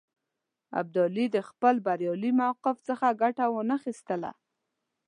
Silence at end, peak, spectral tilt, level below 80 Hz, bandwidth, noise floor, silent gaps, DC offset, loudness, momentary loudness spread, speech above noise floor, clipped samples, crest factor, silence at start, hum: 0.75 s; -10 dBFS; -7 dB/octave; -82 dBFS; 10 kHz; -85 dBFS; none; under 0.1%; -28 LUFS; 9 LU; 58 dB; under 0.1%; 20 dB; 0.7 s; none